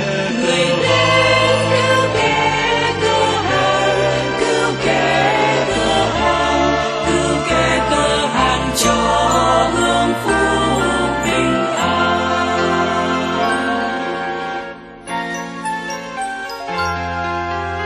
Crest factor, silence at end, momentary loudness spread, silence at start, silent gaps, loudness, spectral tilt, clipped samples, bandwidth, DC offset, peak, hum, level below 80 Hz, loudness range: 16 dB; 0 s; 10 LU; 0 s; none; -16 LUFS; -4 dB/octave; under 0.1%; 13.5 kHz; under 0.1%; 0 dBFS; none; -36 dBFS; 7 LU